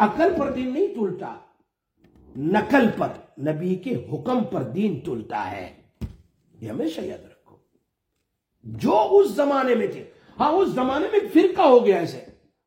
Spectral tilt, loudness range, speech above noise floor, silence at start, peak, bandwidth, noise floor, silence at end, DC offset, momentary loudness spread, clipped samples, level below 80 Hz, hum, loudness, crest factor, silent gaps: -7 dB/octave; 13 LU; 55 dB; 0 s; -4 dBFS; 16.5 kHz; -77 dBFS; 0.35 s; under 0.1%; 21 LU; under 0.1%; -56 dBFS; none; -22 LUFS; 20 dB; none